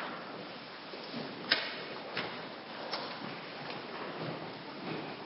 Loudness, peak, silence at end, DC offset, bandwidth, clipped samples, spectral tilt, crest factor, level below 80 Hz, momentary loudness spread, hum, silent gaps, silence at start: -39 LUFS; -8 dBFS; 0 s; under 0.1%; 5.8 kHz; under 0.1%; -1.5 dB/octave; 32 dB; -80 dBFS; 12 LU; none; none; 0 s